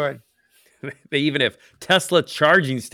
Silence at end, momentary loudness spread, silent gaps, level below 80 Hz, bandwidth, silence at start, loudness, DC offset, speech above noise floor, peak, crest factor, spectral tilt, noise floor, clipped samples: 0.05 s; 20 LU; none; -68 dBFS; 18 kHz; 0 s; -19 LUFS; under 0.1%; 39 dB; -4 dBFS; 18 dB; -4 dB/octave; -60 dBFS; under 0.1%